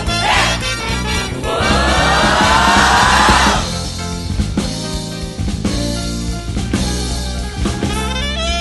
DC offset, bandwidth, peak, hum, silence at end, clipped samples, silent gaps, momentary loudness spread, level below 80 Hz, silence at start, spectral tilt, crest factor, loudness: under 0.1%; 12 kHz; 0 dBFS; none; 0 s; under 0.1%; none; 12 LU; -24 dBFS; 0 s; -3.5 dB/octave; 16 dB; -15 LUFS